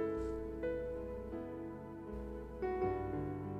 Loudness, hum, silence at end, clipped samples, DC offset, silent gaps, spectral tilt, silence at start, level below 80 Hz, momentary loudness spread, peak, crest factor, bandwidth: -42 LUFS; none; 0 s; under 0.1%; under 0.1%; none; -9 dB/octave; 0 s; -52 dBFS; 9 LU; -26 dBFS; 16 dB; 11 kHz